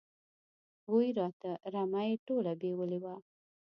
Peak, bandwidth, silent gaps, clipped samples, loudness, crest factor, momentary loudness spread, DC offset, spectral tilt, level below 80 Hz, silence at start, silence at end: -18 dBFS; 5.8 kHz; 1.33-1.40 s, 2.19-2.26 s; under 0.1%; -35 LUFS; 18 dB; 12 LU; under 0.1%; -7 dB/octave; -86 dBFS; 0.9 s; 0.55 s